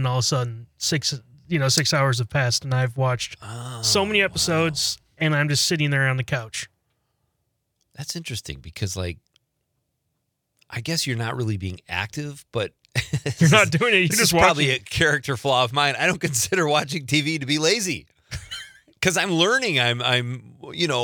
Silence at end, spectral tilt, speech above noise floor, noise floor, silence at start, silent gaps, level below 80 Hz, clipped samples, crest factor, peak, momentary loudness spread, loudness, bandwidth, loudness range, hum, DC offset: 0 s; -3.5 dB/octave; 54 dB; -76 dBFS; 0 s; none; -52 dBFS; under 0.1%; 22 dB; 0 dBFS; 15 LU; -21 LUFS; 19.5 kHz; 13 LU; none; under 0.1%